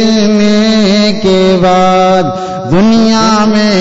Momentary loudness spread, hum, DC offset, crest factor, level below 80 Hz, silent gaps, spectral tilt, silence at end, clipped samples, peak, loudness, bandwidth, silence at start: 3 LU; none; under 0.1%; 6 dB; -34 dBFS; none; -5.5 dB/octave; 0 s; under 0.1%; -2 dBFS; -8 LUFS; 8 kHz; 0 s